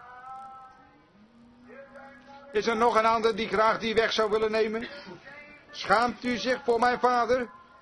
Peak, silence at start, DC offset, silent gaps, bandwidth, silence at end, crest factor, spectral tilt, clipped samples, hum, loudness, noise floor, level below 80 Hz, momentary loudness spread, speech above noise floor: -6 dBFS; 0 s; under 0.1%; none; 11 kHz; 0.25 s; 22 dB; -4 dB/octave; under 0.1%; none; -26 LUFS; -57 dBFS; -60 dBFS; 20 LU; 32 dB